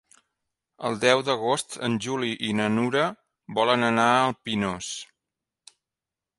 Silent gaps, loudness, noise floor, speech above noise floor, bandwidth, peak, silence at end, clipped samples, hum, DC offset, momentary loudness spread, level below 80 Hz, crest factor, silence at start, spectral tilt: none; -24 LUFS; -89 dBFS; 65 dB; 11.5 kHz; -4 dBFS; 1.35 s; under 0.1%; none; under 0.1%; 11 LU; -64 dBFS; 22 dB; 0.8 s; -4 dB/octave